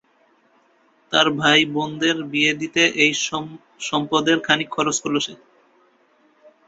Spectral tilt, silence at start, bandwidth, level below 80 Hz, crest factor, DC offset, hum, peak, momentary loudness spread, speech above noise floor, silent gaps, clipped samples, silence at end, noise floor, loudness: -2.5 dB/octave; 1.1 s; 8 kHz; -64 dBFS; 20 dB; under 0.1%; none; -2 dBFS; 9 LU; 39 dB; none; under 0.1%; 1.3 s; -60 dBFS; -19 LUFS